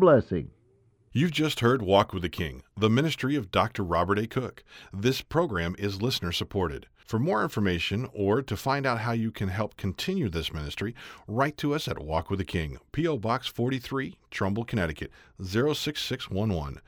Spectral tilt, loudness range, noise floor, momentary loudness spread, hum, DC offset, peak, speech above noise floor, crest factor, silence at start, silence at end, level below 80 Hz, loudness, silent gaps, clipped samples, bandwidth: -6 dB/octave; 4 LU; -63 dBFS; 9 LU; none; under 0.1%; -8 dBFS; 36 dB; 20 dB; 0 s; 0.1 s; -48 dBFS; -28 LUFS; none; under 0.1%; over 20 kHz